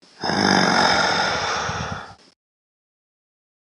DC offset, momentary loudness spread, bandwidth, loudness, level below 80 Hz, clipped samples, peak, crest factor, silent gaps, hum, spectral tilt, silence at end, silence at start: under 0.1%; 12 LU; 11.5 kHz; -19 LUFS; -52 dBFS; under 0.1%; -2 dBFS; 20 dB; none; none; -3 dB/octave; 1.6 s; 0.2 s